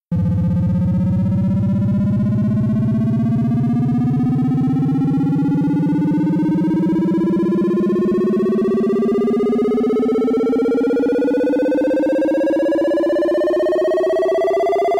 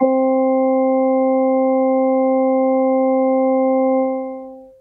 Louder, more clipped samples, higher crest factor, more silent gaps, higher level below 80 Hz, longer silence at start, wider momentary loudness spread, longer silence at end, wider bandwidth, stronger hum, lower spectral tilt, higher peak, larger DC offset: about the same, -17 LUFS vs -16 LUFS; neither; second, 6 dB vs 12 dB; neither; first, -42 dBFS vs -64 dBFS; about the same, 0.1 s vs 0 s; about the same, 1 LU vs 3 LU; second, 0 s vs 0.15 s; first, 10.5 kHz vs 2.2 kHz; neither; second, -9.5 dB/octave vs -11 dB/octave; second, -10 dBFS vs -4 dBFS; neither